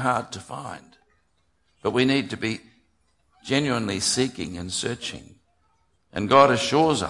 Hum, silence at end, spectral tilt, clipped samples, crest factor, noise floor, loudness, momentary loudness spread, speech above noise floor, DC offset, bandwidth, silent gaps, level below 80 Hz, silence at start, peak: none; 0 s; -4 dB/octave; under 0.1%; 22 dB; -69 dBFS; -23 LUFS; 18 LU; 46 dB; under 0.1%; 11.5 kHz; none; -58 dBFS; 0 s; -2 dBFS